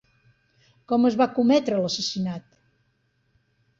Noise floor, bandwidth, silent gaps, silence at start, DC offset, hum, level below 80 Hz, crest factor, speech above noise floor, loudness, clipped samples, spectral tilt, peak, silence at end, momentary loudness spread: -69 dBFS; 7.8 kHz; none; 0.9 s; under 0.1%; none; -66 dBFS; 16 dB; 47 dB; -23 LUFS; under 0.1%; -5 dB/octave; -10 dBFS; 1.4 s; 10 LU